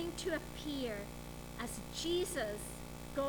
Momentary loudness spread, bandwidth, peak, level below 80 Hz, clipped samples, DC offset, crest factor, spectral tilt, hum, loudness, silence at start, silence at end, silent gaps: 11 LU; over 20 kHz; -26 dBFS; -54 dBFS; under 0.1%; under 0.1%; 16 dB; -4 dB/octave; 60 Hz at -55 dBFS; -41 LUFS; 0 s; 0 s; none